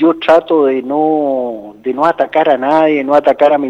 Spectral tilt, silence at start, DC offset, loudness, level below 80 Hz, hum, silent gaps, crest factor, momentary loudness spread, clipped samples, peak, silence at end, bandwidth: -6.5 dB/octave; 0 s; under 0.1%; -12 LUFS; -58 dBFS; none; none; 12 dB; 9 LU; under 0.1%; 0 dBFS; 0 s; 7.8 kHz